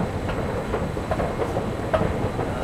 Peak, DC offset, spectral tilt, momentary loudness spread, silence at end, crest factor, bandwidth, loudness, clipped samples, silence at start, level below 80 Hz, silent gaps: -8 dBFS; under 0.1%; -7 dB/octave; 3 LU; 0 s; 18 dB; 15.5 kHz; -26 LUFS; under 0.1%; 0 s; -36 dBFS; none